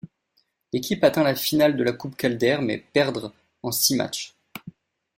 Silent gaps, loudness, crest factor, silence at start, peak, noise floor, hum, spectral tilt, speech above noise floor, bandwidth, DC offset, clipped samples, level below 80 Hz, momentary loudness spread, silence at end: none; -23 LUFS; 20 dB; 0.05 s; -4 dBFS; -70 dBFS; none; -4 dB/octave; 47 dB; 16.5 kHz; under 0.1%; under 0.1%; -60 dBFS; 17 LU; 0.45 s